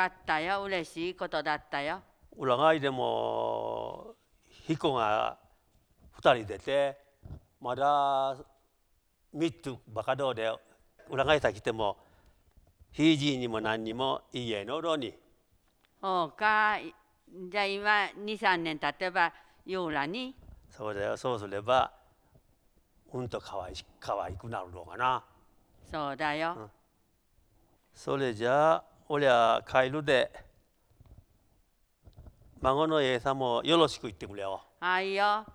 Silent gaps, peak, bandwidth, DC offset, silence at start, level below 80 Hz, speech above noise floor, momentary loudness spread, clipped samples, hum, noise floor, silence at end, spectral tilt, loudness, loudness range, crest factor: none; -8 dBFS; 12.5 kHz; under 0.1%; 0 s; -60 dBFS; 42 dB; 16 LU; under 0.1%; none; -72 dBFS; 0 s; -5 dB/octave; -30 LUFS; 6 LU; 24 dB